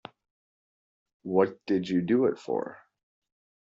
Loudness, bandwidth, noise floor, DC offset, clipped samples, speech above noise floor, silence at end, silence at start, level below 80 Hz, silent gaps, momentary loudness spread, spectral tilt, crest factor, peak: -28 LUFS; 7.6 kHz; under -90 dBFS; under 0.1%; under 0.1%; over 63 dB; 0.85 s; 1.25 s; -72 dBFS; none; 10 LU; -6.5 dB/octave; 22 dB; -10 dBFS